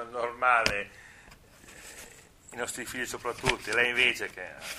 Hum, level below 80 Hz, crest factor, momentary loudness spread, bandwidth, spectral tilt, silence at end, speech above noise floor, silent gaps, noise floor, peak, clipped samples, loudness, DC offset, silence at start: none; -54 dBFS; 30 dB; 22 LU; 15.5 kHz; -2 dB/octave; 0 s; 25 dB; none; -54 dBFS; -2 dBFS; under 0.1%; -28 LUFS; under 0.1%; 0 s